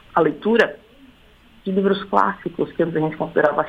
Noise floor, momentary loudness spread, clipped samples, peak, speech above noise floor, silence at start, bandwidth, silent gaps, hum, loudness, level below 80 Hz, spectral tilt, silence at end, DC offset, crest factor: -50 dBFS; 7 LU; under 0.1%; 0 dBFS; 31 dB; 0.15 s; 9 kHz; none; none; -20 LUFS; -54 dBFS; -7.5 dB/octave; 0 s; under 0.1%; 20 dB